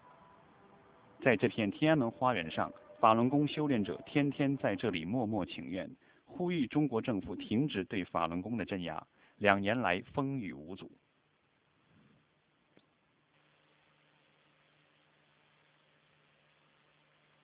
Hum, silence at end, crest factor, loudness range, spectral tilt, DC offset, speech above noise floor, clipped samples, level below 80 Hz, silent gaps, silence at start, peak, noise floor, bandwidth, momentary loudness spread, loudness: none; 6.55 s; 28 dB; 5 LU; -5 dB/octave; under 0.1%; 41 dB; under 0.1%; -66 dBFS; none; 1.2 s; -8 dBFS; -74 dBFS; 4 kHz; 12 LU; -33 LUFS